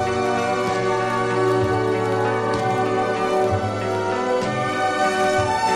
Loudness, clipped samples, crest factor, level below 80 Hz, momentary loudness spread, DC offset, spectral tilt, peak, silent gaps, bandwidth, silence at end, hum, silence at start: -21 LUFS; under 0.1%; 12 dB; -50 dBFS; 3 LU; under 0.1%; -5.5 dB/octave; -8 dBFS; none; 13.5 kHz; 0 s; none; 0 s